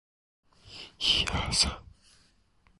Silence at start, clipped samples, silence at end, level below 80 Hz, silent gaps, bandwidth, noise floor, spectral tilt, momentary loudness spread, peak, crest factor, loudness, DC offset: 0.65 s; under 0.1%; 0.95 s; -44 dBFS; none; 11.5 kHz; -66 dBFS; -1.5 dB/octave; 21 LU; -12 dBFS; 22 dB; -26 LUFS; under 0.1%